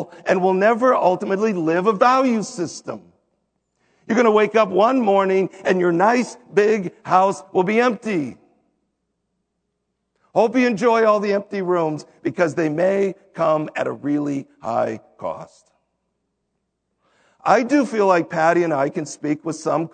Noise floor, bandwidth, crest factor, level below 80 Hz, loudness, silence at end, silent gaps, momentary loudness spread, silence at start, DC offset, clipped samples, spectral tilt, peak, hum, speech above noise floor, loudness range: -75 dBFS; 9.4 kHz; 20 dB; -72 dBFS; -19 LUFS; 0.05 s; none; 11 LU; 0 s; under 0.1%; under 0.1%; -6 dB/octave; 0 dBFS; none; 56 dB; 7 LU